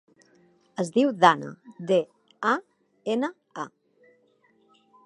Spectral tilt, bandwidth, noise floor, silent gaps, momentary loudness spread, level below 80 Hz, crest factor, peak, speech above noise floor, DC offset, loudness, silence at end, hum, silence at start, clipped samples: -5 dB/octave; 11.5 kHz; -64 dBFS; none; 20 LU; -82 dBFS; 24 dB; -2 dBFS; 41 dB; under 0.1%; -25 LUFS; 1.4 s; none; 0.8 s; under 0.1%